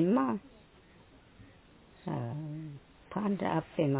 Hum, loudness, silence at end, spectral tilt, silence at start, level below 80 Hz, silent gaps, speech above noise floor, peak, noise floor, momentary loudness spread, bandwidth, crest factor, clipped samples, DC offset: none; -35 LUFS; 0 s; -7.5 dB/octave; 0 s; -64 dBFS; none; 28 dB; -16 dBFS; -59 dBFS; 15 LU; 4 kHz; 18 dB; under 0.1%; under 0.1%